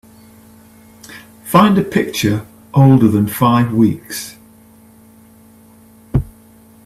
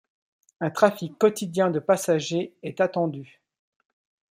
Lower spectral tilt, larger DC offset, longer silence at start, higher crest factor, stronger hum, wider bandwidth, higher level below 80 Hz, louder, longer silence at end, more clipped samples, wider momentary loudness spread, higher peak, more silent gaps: about the same, -6.5 dB/octave vs -5.5 dB/octave; neither; first, 1.1 s vs 0.6 s; second, 16 dB vs 22 dB; neither; about the same, 15 kHz vs 16 kHz; first, -40 dBFS vs -72 dBFS; first, -14 LUFS vs -24 LUFS; second, 0.55 s vs 1.1 s; neither; first, 23 LU vs 9 LU; first, 0 dBFS vs -4 dBFS; neither